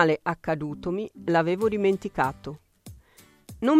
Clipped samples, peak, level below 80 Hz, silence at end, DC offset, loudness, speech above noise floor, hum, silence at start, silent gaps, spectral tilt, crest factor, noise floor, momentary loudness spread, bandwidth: under 0.1%; -6 dBFS; -56 dBFS; 0 s; under 0.1%; -26 LUFS; 31 dB; none; 0 s; none; -7 dB/octave; 20 dB; -56 dBFS; 12 LU; 15.5 kHz